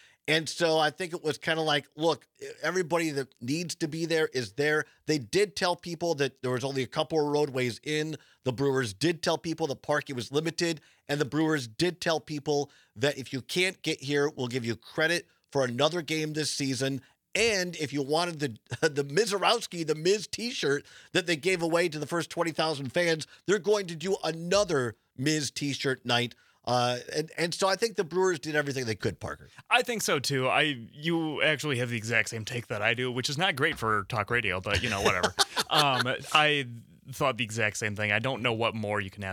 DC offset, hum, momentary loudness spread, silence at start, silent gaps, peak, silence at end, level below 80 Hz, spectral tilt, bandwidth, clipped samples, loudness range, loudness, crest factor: under 0.1%; none; 7 LU; 0.25 s; none; -4 dBFS; 0 s; -62 dBFS; -4 dB/octave; 19 kHz; under 0.1%; 4 LU; -28 LUFS; 26 dB